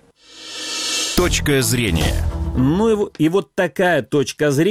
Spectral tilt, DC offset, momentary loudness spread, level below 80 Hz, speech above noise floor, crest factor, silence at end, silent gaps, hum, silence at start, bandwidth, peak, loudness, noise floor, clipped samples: -4.5 dB/octave; under 0.1%; 6 LU; -30 dBFS; 23 dB; 16 dB; 0 s; none; none; 0.35 s; 17 kHz; -2 dBFS; -18 LUFS; -40 dBFS; under 0.1%